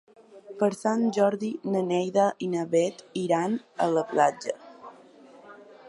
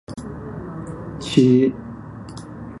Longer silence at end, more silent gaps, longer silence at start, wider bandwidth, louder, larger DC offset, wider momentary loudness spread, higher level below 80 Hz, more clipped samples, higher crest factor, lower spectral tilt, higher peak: about the same, 0 s vs 0 s; neither; first, 0.35 s vs 0.1 s; about the same, 11.5 kHz vs 11.5 kHz; second, -26 LUFS vs -18 LUFS; neither; second, 11 LU vs 21 LU; second, -78 dBFS vs -46 dBFS; neither; about the same, 20 dB vs 20 dB; about the same, -6 dB/octave vs -7 dB/octave; second, -8 dBFS vs -2 dBFS